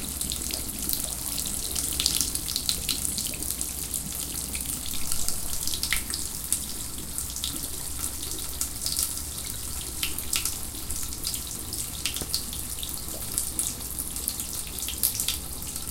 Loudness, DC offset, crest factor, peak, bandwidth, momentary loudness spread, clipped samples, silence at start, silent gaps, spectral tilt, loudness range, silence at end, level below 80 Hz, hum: -28 LUFS; under 0.1%; 30 dB; 0 dBFS; 17 kHz; 6 LU; under 0.1%; 0 s; none; -1 dB/octave; 3 LU; 0 s; -42 dBFS; none